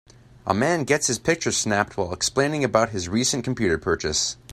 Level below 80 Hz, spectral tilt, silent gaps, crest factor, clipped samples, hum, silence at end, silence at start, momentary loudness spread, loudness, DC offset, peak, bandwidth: -50 dBFS; -3.5 dB/octave; none; 20 dB; under 0.1%; none; 0 s; 0.45 s; 3 LU; -22 LUFS; under 0.1%; -2 dBFS; 15.5 kHz